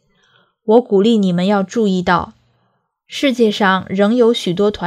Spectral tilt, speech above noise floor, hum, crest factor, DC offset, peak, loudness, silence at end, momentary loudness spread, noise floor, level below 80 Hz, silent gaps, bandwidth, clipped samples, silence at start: -6 dB/octave; 50 dB; none; 16 dB; under 0.1%; 0 dBFS; -15 LUFS; 0 s; 6 LU; -64 dBFS; -50 dBFS; none; 13 kHz; under 0.1%; 0.65 s